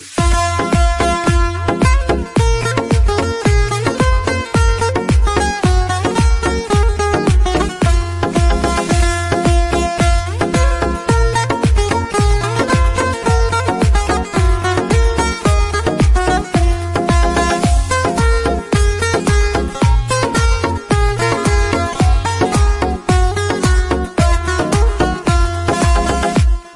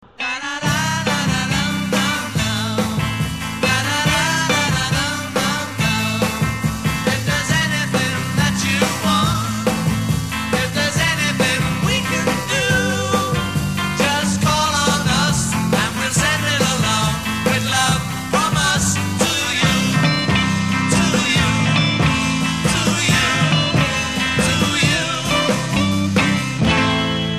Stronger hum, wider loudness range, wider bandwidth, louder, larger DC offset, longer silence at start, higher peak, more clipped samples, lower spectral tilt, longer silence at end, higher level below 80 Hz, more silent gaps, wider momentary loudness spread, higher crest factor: neither; about the same, 0 LU vs 2 LU; second, 11.5 kHz vs 15.5 kHz; about the same, -15 LUFS vs -17 LUFS; second, under 0.1% vs 0.5%; second, 0 s vs 0.2 s; about the same, -2 dBFS vs -2 dBFS; neither; first, -5.5 dB/octave vs -4 dB/octave; about the same, 0 s vs 0 s; first, -16 dBFS vs -36 dBFS; neither; about the same, 2 LU vs 4 LU; about the same, 12 dB vs 16 dB